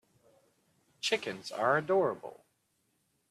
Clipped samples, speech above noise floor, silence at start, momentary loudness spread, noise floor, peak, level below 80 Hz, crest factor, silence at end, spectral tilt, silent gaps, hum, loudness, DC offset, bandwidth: under 0.1%; 45 dB; 1.05 s; 14 LU; -77 dBFS; -14 dBFS; -80 dBFS; 20 dB; 0.95 s; -4 dB/octave; none; none; -31 LUFS; under 0.1%; 13.5 kHz